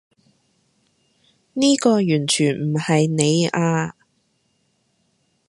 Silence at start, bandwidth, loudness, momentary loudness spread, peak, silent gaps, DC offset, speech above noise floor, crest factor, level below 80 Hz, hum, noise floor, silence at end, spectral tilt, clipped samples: 1.55 s; 11.5 kHz; -19 LUFS; 7 LU; 0 dBFS; none; under 0.1%; 49 dB; 22 dB; -64 dBFS; none; -67 dBFS; 1.6 s; -5 dB/octave; under 0.1%